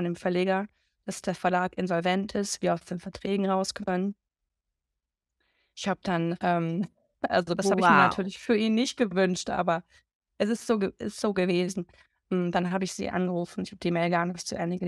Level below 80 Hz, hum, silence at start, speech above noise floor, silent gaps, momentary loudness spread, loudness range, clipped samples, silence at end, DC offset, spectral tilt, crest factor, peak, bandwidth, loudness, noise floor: -62 dBFS; none; 0 s; 59 dB; 10.15-10.20 s; 9 LU; 7 LU; under 0.1%; 0 s; under 0.1%; -5.5 dB/octave; 22 dB; -6 dBFS; 12.5 kHz; -28 LUFS; -87 dBFS